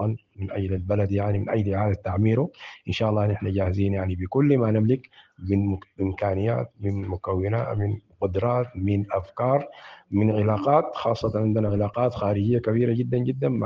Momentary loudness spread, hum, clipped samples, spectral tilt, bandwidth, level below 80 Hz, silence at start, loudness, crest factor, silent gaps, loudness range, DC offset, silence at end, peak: 8 LU; none; under 0.1%; -9.5 dB/octave; 6.6 kHz; -54 dBFS; 0 s; -25 LUFS; 18 dB; none; 3 LU; under 0.1%; 0 s; -6 dBFS